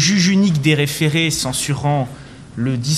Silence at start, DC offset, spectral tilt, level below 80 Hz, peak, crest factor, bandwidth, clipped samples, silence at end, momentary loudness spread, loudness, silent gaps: 0 s; 0.2%; -4.5 dB/octave; -46 dBFS; -4 dBFS; 14 dB; 15.5 kHz; under 0.1%; 0 s; 12 LU; -17 LUFS; none